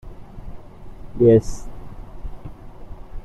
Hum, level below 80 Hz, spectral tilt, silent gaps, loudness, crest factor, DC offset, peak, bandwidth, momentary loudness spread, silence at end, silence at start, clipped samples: none; -36 dBFS; -8.5 dB/octave; none; -16 LUFS; 20 dB; under 0.1%; -4 dBFS; 12 kHz; 28 LU; 0 s; 0.05 s; under 0.1%